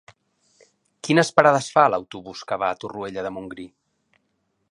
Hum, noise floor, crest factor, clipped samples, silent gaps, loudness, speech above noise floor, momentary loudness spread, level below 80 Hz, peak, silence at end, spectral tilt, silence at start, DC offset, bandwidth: none; -72 dBFS; 24 dB; under 0.1%; none; -21 LUFS; 51 dB; 20 LU; -64 dBFS; 0 dBFS; 1.05 s; -5 dB/octave; 1.05 s; under 0.1%; 11.5 kHz